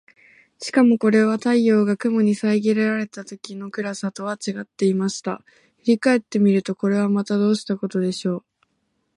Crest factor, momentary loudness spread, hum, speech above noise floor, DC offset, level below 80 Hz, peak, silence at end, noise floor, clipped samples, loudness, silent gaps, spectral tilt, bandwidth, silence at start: 16 dB; 13 LU; none; 51 dB; under 0.1%; -70 dBFS; -6 dBFS; 0.75 s; -71 dBFS; under 0.1%; -21 LUFS; none; -6 dB/octave; 11 kHz; 0.6 s